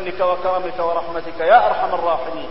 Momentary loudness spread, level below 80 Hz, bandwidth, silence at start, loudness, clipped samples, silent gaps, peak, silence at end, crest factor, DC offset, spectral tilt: 10 LU; -48 dBFS; 5.8 kHz; 0 s; -18 LUFS; under 0.1%; none; 0 dBFS; 0 s; 18 dB; 4%; -9 dB/octave